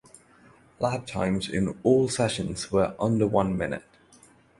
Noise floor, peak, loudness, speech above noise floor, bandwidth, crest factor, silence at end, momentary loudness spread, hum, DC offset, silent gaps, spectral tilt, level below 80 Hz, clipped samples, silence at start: -56 dBFS; -8 dBFS; -26 LUFS; 31 dB; 11.5 kHz; 20 dB; 0.8 s; 8 LU; none; under 0.1%; none; -5.5 dB/octave; -50 dBFS; under 0.1%; 0.8 s